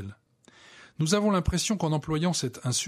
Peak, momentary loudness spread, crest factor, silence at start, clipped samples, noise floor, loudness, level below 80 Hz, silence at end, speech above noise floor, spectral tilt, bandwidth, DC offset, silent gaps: -10 dBFS; 6 LU; 18 dB; 0 s; under 0.1%; -58 dBFS; -27 LUFS; -44 dBFS; 0 s; 32 dB; -4.5 dB/octave; 15 kHz; under 0.1%; none